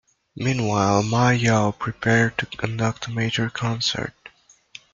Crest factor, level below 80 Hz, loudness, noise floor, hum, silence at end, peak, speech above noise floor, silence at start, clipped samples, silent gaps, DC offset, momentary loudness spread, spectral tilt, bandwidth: 20 dB; -52 dBFS; -22 LUFS; -49 dBFS; none; 0.65 s; -2 dBFS; 28 dB; 0.35 s; under 0.1%; none; under 0.1%; 8 LU; -5 dB/octave; 7.6 kHz